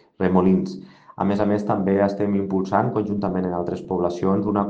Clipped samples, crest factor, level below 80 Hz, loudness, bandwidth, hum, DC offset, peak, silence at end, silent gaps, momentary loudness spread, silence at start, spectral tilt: under 0.1%; 18 dB; -56 dBFS; -22 LUFS; 7 kHz; none; under 0.1%; -4 dBFS; 0 s; none; 7 LU; 0.2 s; -9 dB/octave